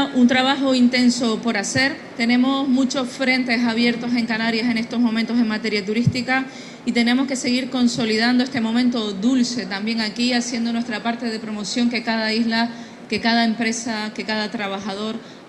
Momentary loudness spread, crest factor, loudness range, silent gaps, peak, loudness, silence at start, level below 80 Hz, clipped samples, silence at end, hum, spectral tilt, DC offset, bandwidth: 8 LU; 16 dB; 3 LU; none; -4 dBFS; -20 LUFS; 0 s; -60 dBFS; under 0.1%; 0 s; none; -4 dB/octave; under 0.1%; 11.5 kHz